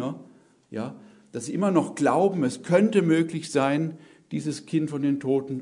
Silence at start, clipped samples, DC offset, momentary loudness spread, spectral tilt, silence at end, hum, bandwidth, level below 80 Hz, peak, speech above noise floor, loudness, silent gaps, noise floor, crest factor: 0 s; under 0.1%; under 0.1%; 14 LU; -6.5 dB/octave; 0 s; none; 11 kHz; -72 dBFS; -6 dBFS; 30 dB; -25 LUFS; none; -54 dBFS; 18 dB